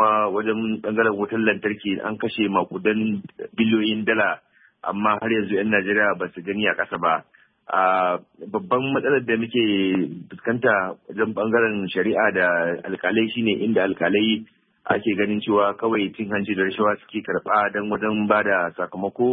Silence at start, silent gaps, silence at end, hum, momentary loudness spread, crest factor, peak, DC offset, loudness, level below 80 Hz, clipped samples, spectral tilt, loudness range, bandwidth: 0 s; none; 0 s; none; 7 LU; 18 dB; -4 dBFS; under 0.1%; -22 LUFS; -64 dBFS; under 0.1%; -10.5 dB/octave; 1 LU; 4 kHz